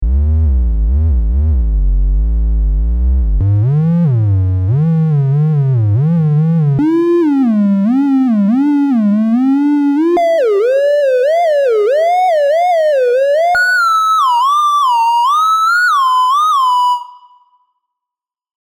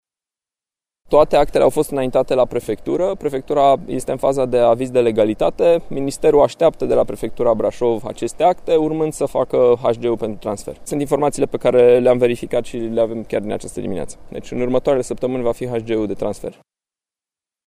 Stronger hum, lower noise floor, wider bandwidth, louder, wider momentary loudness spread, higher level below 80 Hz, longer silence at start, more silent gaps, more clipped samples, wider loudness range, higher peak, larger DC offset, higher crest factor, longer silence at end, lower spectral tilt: neither; second, -85 dBFS vs under -90 dBFS; first, 17 kHz vs 15 kHz; first, -12 LUFS vs -18 LUFS; second, 5 LU vs 11 LU; first, -20 dBFS vs -40 dBFS; second, 0 s vs 1.1 s; neither; neither; about the same, 3 LU vs 5 LU; second, -4 dBFS vs 0 dBFS; neither; second, 8 dB vs 16 dB; first, 1.5 s vs 1.15 s; first, -7.5 dB/octave vs -6 dB/octave